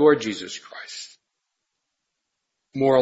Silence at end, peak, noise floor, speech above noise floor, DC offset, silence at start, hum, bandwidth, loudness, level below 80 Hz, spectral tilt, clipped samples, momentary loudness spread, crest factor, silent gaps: 0 s; -4 dBFS; -80 dBFS; 59 dB; under 0.1%; 0 s; none; 8 kHz; -25 LUFS; -68 dBFS; -5 dB/octave; under 0.1%; 17 LU; 20 dB; none